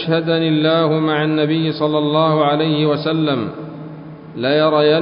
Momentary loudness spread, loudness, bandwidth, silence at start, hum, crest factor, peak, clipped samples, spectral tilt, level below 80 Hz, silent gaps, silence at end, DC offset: 17 LU; -16 LUFS; 5.4 kHz; 0 s; none; 14 dB; -2 dBFS; under 0.1%; -12 dB/octave; -58 dBFS; none; 0 s; under 0.1%